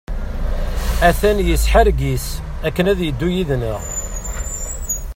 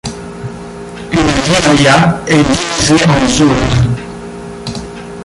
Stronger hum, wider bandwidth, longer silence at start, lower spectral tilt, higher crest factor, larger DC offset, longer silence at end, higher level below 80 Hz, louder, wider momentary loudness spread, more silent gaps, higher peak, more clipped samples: neither; first, 16.5 kHz vs 11.5 kHz; about the same, 0.1 s vs 0.05 s; about the same, -5 dB/octave vs -4.5 dB/octave; first, 18 dB vs 12 dB; neither; about the same, 0 s vs 0 s; first, -22 dBFS vs -30 dBFS; second, -19 LUFS vs -10 LUFS; second, 12 LU vs 18 LU; neither; about the same, 0 dBFS vs 0 dBFS; neither